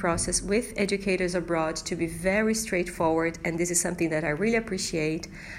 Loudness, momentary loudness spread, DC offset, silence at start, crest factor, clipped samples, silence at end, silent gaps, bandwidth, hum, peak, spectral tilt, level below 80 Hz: -27 LUFS; 4 LU; under 0.1%; 0 s; 18 dB; under 0.1%; 0 s; none; 16 kHz; none; -10 dBFS; -4 dB/octave; -46 dBFS